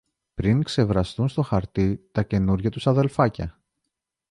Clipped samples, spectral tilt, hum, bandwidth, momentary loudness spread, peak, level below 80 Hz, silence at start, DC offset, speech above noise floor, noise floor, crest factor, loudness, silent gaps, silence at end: under 0.1%; -8 dB/octave; none; 11 kHz; 6 LU; -6 dBFS; -40 dBFS; 0.4 s; under 0.1%; 59 dB; -82 dBFS; 18 dB; -23 LUFS; none; 0.8 s